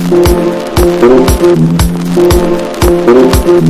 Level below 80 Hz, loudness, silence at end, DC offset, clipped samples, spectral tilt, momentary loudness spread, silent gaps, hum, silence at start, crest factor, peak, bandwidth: -16 dBFS; -8 LUFS; 0 s; under 0.1%; 1%; -6.5 dB/octave; 5 LU; none; none; 0 s; 6 dB; 0 dBFS; 16 kHz